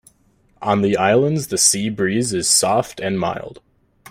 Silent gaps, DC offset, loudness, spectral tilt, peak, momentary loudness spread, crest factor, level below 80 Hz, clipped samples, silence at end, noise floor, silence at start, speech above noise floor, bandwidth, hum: none; under 0.1%; -17 LUFS; -3.5 dB/octave; 0 dBFS; 10 LU; 20 dB; -54 dBFS; under 0.1%; 0.6 s; -58 dBFS; 0.6 s; 40 dB; 16 kHz; none